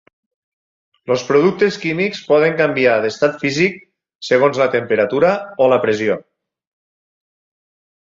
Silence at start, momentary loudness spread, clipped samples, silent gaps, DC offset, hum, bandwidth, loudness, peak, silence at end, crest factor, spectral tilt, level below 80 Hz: 1.1 s; 7 LU; under 0.1%; none; under 0.1%; none; 7.6 kHz; -16 LUFS; -2 dBFS; 1.95 s; 16 dB; -5.5 dB/octave; -60 dBFS